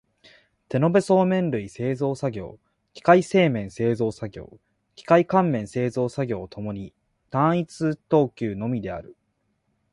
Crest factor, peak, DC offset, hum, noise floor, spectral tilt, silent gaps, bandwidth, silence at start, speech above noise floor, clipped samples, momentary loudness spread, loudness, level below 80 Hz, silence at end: 20 dB; -4 dBFS; under 0.1%; none; -72 dBFS; -7.5 dB/octave; none; 11.5 kHz; 0.7 s; 49 dB; under 0.1%; 17 LU; -23 LUFS; -56 dBFS; 0.8 s